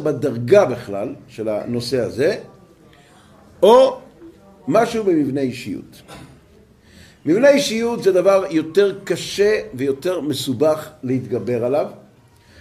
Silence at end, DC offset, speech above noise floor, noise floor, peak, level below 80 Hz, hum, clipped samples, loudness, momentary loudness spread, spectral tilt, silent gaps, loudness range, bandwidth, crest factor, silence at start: 0.6 s; under 0.1%; 32 dB; -50 dBFS; 0 dBFS; -56 dBFS; none; under 0.1%; -18 LUFS; 14 LU; -5.5 dB/octave; none; 4 LU; 15.5 kHz; 18 dB; 0 s